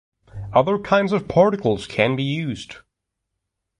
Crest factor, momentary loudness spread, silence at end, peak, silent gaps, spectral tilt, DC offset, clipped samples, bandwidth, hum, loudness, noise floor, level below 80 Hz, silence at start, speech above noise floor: 18 dB; 14 LU; 1 s; -4 dBFS; none; -6.5 dB/octave; under 0.1%; under 0.1%; 11 kHz; none; -20 LUFS; -80 dBFS; -50 dBFS; 0.35 s; 60 dB